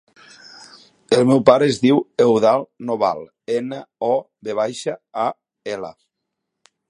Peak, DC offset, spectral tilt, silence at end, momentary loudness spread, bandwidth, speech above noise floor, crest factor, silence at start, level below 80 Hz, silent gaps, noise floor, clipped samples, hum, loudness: 0 dBFS; under 0.1%; -6 dB/octave; 1 s; 16 LU; 11.5 kHz; 61 dB; 20 dB; 1.1 s; -62 dBFS; none; -79 dBFS; under 0.1%; none; -19 LUFS